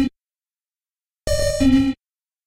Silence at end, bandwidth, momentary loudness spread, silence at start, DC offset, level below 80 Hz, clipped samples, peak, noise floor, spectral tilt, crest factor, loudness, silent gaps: 0.5 s; 16 kHz; 15 LU; 0 s; under 0.1%; -34 dBFS; under 0.1%; -6 dBFS; under -90 dBFS; -5.5 dB/octave; 16 dB; -19 LUFS; none